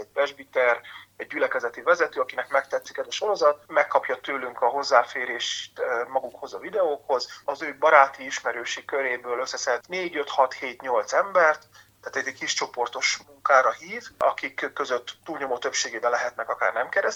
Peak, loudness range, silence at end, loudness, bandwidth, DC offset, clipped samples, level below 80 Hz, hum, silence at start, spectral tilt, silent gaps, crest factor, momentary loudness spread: -2 dBFS; 2 LU; 0 s; -25 LUFS; 18 kHz; under 0.1%; under 0.1%; -72 dBFS; none; 0 s; -1 dB/octave; none; 24 dB; 11 LU